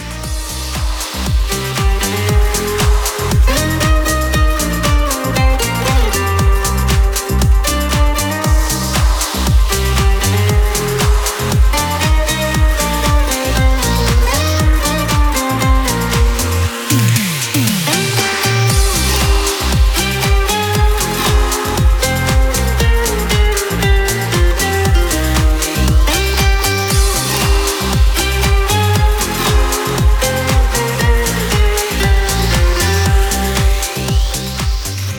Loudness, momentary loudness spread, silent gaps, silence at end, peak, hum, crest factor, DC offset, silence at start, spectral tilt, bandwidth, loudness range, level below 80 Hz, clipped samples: -14 LUFS; 3 LU; none; 0 s; 0 dBFS; none; 12 dB; under 0.1%; 0 s; -4 dB/octave; 20 kHz; 1 LU; -16 dBFS; under 0.1%